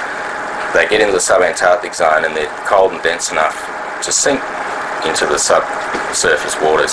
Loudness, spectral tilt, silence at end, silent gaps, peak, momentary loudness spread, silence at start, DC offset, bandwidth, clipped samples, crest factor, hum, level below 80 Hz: -14 LUFS; -1.5 dB/octave; 0 s; none; 0 dBFS; 9 LU; 0 s; under 0.1%; 11 kHz; under 0.1%; 14 dB; none; -46 dBFS